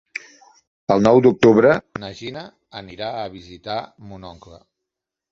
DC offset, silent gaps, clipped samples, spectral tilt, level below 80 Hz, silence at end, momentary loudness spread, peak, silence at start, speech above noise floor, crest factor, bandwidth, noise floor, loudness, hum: under 0.1%; none; under 0.1%; -7 dB/octave; -52 dBFS; 1 s; 25 LU; -2 dBFS; 0.9 s; 65 dB; 18 dB; 7.8 kHz; -84 dBFS; -17 LUFS; none